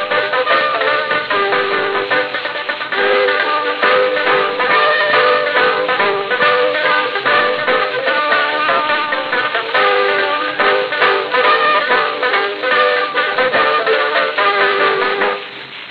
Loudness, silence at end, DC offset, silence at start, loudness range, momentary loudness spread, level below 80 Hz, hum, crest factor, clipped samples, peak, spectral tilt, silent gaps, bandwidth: -14 LUFS; 0 s; 0.2%; 0 s; 2 LU; 4 LU; -66 dBFS; none; 14 dB; under 0.1%; 0 dBFS; -4.5 dB/octave; none; 5.6 kHz